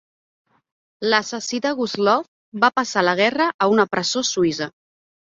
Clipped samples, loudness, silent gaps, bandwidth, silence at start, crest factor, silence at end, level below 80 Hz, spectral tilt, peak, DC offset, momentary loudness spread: under 0.1%; -20 LUFS; 2.28-2.52 s, 3.54-3.59 s; 7.8 kHz; 1 s; 20 dB; 0.7 s; -64 dBFS; -3.5 dB/octave; -2 dBFS; under 0.1%; 8 LU